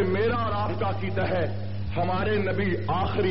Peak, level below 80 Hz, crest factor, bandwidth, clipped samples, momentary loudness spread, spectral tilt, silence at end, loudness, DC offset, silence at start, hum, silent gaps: -14 dBFS; -44 dBFS; 12 dB; 5.8 kHz; under 0.1%; 4 LU; -5.5 dB/octave; 0 s; -27 LUFS; 2%; 0 s; none; none